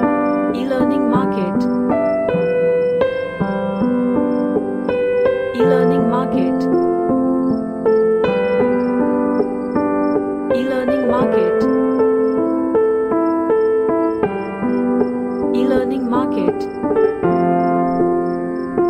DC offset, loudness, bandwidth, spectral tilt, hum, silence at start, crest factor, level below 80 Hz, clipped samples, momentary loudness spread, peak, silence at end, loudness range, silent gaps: under 0.1%; -17 LUFS; 9.4 kHz; -8.5 dB/octave; none; 0 s; 14 dB; -48 dBFS; under 0.1%; 4 LU; -2 dBFS; 0 s; 1 LU; none